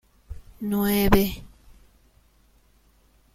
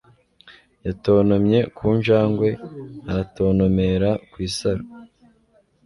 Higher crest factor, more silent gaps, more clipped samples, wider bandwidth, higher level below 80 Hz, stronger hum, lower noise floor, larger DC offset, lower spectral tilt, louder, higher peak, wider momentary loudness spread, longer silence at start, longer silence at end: first, 24 dB vs 16 dB; neither; neither; first, 16.5 kHz vs 11.5 kHz; about the same, -38 dBFS vs -42 dBFS; neither; about the same, -60 dBFS vs -60 dBFS; neither; second, -5.5 dB/octave vs -7.5 dB/octave; second, -23 LUFS vs -20 LUFS; about the same, -4 dBFS vs -6 dBFS; first, 26 LU vs 15 LU; second, 0.3 s vs 0.45 s; first, 1.9 s vs 0.8 s